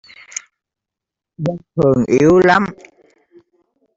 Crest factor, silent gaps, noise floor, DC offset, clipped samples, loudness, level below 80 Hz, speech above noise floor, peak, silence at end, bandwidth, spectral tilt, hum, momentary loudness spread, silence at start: 16 dB; none; -85 dBFS; under 0.1%; under 0.1%; -14 LUFS; -48 dBFS; 71 dB; -2 dBFS; 1.25 s; 7.8 kHz; -6 dB/octave; none; 19 LU; 1.4 s